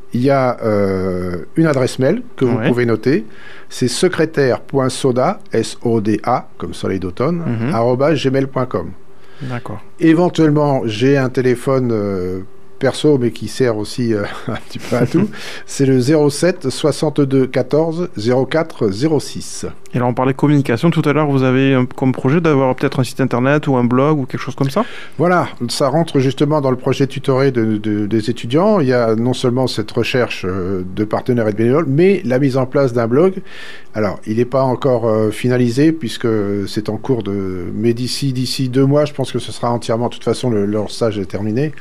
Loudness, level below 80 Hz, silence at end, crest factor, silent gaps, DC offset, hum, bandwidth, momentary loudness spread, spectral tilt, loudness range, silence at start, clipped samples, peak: -16 LUFS; -50 dBFS; 0.1 s; 14 dB; none; 3%; none; 14.5 kHz; 8 LU; -6.5 dB/octave; 3 LU; 0.15 s; under 0.1%; -2 dBFS